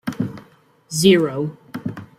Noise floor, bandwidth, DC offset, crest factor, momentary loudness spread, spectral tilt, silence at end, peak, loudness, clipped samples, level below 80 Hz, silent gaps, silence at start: -52 dBFS; 16 kHz; under 0.1%; 18 dB; 16 LU; -5 dB/octave; 0.15 s; -2 dBFS; -19 LUFS; under 0.1%; -58 dBFS; none; 0.05 s